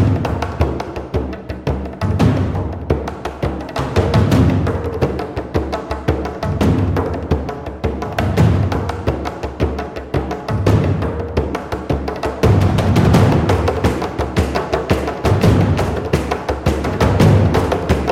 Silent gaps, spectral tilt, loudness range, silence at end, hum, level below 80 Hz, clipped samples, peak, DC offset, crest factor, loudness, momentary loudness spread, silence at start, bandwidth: none; -7.5 dB/octave; 4 LU; 0 s; none; -26 dBFS; under 0.1%; -2 dBFS; 0.1%; 14 dB; -18 LUFS; 10 LU; 0 s; 15 kHz